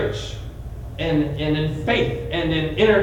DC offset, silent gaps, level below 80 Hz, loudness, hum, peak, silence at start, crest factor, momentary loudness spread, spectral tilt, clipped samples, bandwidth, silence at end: under 0.1%; none; -36 dBFS; -22 LUFS; none; -4 dBFS; 0 s; 16 dB; 15 LU; -6.5 dB/octave; under 0.1%; 17 kHz; 0 s